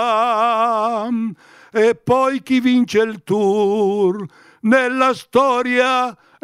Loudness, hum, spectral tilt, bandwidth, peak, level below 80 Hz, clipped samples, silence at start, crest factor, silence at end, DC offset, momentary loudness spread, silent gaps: -17 LUFS; none; -5.5 dB/octave; 13 kHz; -2 dBFS; -62 dBFS; under 0.1%; 0 s; 14 dB; 0.3 s; under 0.1%; 8 LU; none